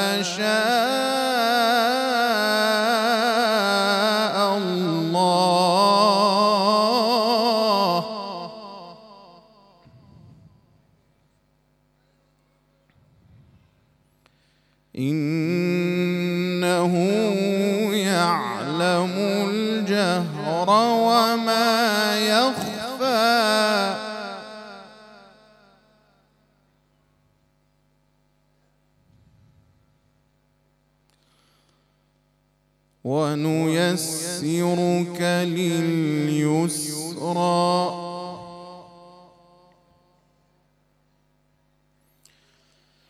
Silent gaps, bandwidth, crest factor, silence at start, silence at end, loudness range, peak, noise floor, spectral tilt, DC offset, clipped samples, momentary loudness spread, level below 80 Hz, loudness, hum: none; 15 kHz; 18 dB; 0 s; 4.25 s; 11 LU; -4 dBFS; -65 dBFS; -4.5 dB/octave; under 0.1%; under 0.1%; 13 LU; -70 dBFS; -21 LUFS; 50 Hz at -55 dBFS